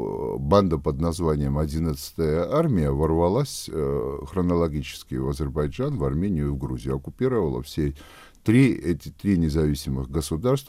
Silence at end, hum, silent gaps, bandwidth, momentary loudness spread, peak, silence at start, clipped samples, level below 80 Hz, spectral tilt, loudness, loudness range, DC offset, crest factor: 0 s; none; none; 16 kHz; 9 LU; -4 dBFS; 0 s; under 0.1%; -36 dBFS; -7 dB/octave; -25 LUFS; 3 LU; under 0.1%; 18 dB